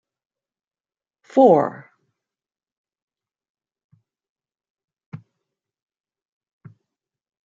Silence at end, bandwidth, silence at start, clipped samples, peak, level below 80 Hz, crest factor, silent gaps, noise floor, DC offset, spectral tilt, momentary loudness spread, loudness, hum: 2.3 s; 7.6 kHz; 1.35 s; under 0.1%; -2 dBFS; -78 dBFS; 24 dB; 2.72-2.84 s, 3.02-3.08 s, 3.50-3.55 s, 3.84-3.89 s, 4.29-4.36 s, 4.70-4.75 s, 5.06-5.12 s; under -90 dBFS; under 0.1%; -8.5 dB/octave; 28 LU; -17 LUFS; none